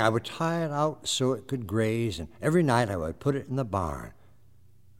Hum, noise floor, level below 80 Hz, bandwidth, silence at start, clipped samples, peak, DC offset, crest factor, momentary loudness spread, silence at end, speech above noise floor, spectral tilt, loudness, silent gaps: none; -60 dBFS; -52 dBFS; 16 kHz; 0 s; under 0.1%; -8 dBFS; 0.2%; 20 dB; 8 LU; 0.9 s; 33 dB; -5.5 dB/octave; -28 LUFS; none